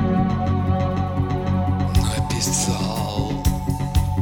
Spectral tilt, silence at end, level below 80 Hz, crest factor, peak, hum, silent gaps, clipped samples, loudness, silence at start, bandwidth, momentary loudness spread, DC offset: -5.5 dB/octave; 0 s; -30 dBFS; 14 dB; -6 dBFS; none; none; under 0.1%; -22 LUFS; 0 s; over 20 kHz; 3 LU; under 0.1%